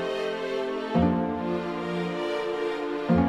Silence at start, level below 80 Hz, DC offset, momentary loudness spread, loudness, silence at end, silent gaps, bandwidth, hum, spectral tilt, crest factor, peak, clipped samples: 0 s; -48 dBFS; under 0.1%; 5 LU; -28 LUFS; 0 s; none; 9.8 kHz; none; -7.5 dB/octave; 16 dB; -10 dBFS; under 0.1%